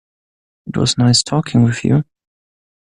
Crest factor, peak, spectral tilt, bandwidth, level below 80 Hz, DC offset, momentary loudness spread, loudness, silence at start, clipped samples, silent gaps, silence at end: 16 dB; -2 dBFS; -5 dB/octave; 11 kHz; -48 dBFS; under 0.1%; 9 LU; -15 LUFS; 0.65 s; under 0.1%; none; 0.85 s